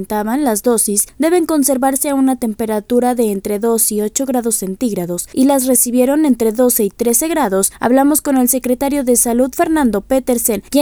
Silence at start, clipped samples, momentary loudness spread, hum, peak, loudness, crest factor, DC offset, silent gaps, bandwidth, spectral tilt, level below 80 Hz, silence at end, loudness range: 0 s; under 0.1%; 6 LU; none; 0 dBFS; -14 LUFS; 14 dB; under 0.1%; none; over 20 kHz; -4 dB/octave; -44 dBFS; 0 s; 3 LU